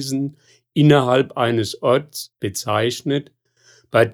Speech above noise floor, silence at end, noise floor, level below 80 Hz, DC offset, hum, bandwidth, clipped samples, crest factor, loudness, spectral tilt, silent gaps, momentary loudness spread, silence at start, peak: 36 dB; 0 s; -55 dBFS; -60 dBFS; under 0.1%; none; 17.5 kHz; under 0.1%; 18 dB; -19 LUFS; -5.5 dB/octave; none; 12 LU; 0 s; -2 dBFS